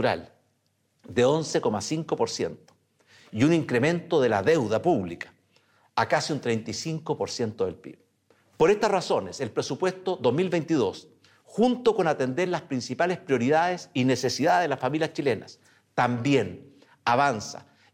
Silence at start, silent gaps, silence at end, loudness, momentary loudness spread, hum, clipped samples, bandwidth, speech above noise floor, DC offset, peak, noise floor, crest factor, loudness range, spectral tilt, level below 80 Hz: 0 s; none; 0.3 s; -26 LUFS; 10 LU; none; under 0.1%; 15 kHz; 46 dB; under 0.1%; -10 dBFS; -71 dBFS; 16 dB; 3 LU; -5.5 dB/octave; -66 dBFS